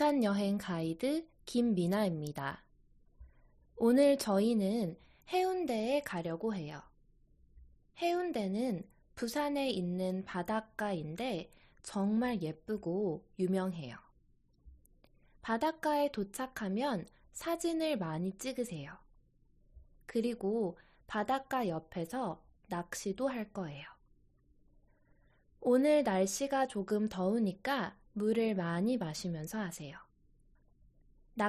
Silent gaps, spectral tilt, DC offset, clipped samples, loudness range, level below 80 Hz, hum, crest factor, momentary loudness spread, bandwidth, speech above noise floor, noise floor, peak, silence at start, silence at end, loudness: none; -5.5 dB/octave; under 0.1%; under 0.1%; 6 LU; -66 dBFS; none; 20 dB; 12 LU; 14 kHz; 35 dB; -69 dBFS; -16 dBFS; 0 s; 0 s; -35 LUFS